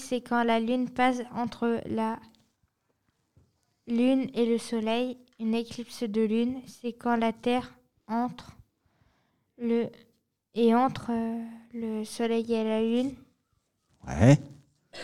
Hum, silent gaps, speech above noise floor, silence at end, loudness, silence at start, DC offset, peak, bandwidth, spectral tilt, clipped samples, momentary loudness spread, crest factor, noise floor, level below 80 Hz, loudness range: none; none; 48 dB; 0 s; -28 LUFS; 0 s; under 0.1%; -8 dBFS; 12.5 kHz; -6.5 dB/octave; under 0.1%; 14 LU; 22 dB; -75 dBFS; -58 dBFS; 4 LU